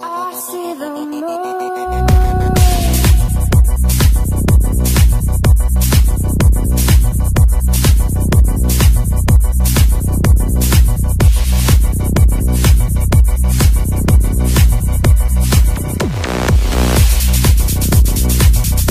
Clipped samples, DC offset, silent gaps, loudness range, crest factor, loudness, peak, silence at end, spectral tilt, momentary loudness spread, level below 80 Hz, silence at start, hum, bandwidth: under 0.1%; under 0.1%; none; 1 LU; 10 dB; -13 LUFS; 0 dBFS; 0 s; -5.5 dB/octave; 6 LU; -12 dBFS; 0 s; none; 15.5 kHz